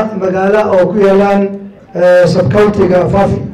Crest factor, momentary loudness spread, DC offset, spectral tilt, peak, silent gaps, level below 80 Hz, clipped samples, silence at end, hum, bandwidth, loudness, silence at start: 6 dB; 6 LU; under 0.1%; -7.5 dB/octave; -4 dBFS; none; -36 dBFS; under 0.1%; 0 s; none; 10.5 kHz; -10 LUFS; 0 s